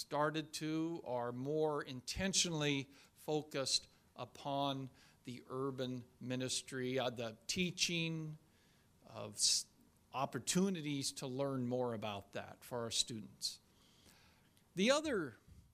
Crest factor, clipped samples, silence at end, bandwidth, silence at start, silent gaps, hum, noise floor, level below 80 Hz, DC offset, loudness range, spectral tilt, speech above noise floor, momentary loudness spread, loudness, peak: 22 dB; under 0.1%; 0.15 s; 15.5 kHz; 0 s; none; none; -70 dBFS; -68 dBFS; under 0.1%; 4 LU; -3.5 dB/octave; 31 dB; 16 LU; -39 LUFS; -20 dBFS